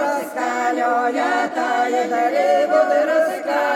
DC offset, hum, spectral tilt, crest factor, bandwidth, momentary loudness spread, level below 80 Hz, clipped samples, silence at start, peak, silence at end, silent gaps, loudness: under 0.1%; none; -3 dB/octave; 14 dB; 16 kHz; 5 LU; -76 dBFS; under 0.1%; 0 s; -4 dBFS; 0 s; none; -19 LUFS